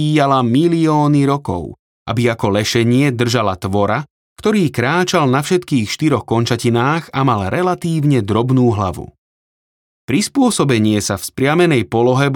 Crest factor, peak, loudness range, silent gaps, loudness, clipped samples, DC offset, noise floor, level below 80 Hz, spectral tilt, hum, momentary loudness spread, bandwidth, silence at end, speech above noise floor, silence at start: 14 dB; -2 dBFS; 2 LU; 1.79-2.06 s, 4.10-4.36 s, 9.18-10.08 s; -15 LUFS; under 0.1%; under 0.1%; under -90 dBFS; -50 dBFS; -6 dB/octave; none; 7 LU; 18.5 kHz; 0 s; over 75 dB; 0 s